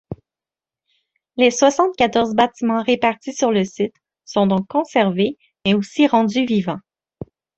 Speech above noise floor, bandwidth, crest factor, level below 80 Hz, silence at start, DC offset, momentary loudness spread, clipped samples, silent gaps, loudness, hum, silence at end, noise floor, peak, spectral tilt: 72 dB; 8.2 kHz; 18 dB; -56 dBFS; 0.1 s; under 0.1%; 16 LU; under 0.1%; none; -18 LUFS; none; 0.8 s; -90 dBFS; -2 dBFS; -5 dB/octave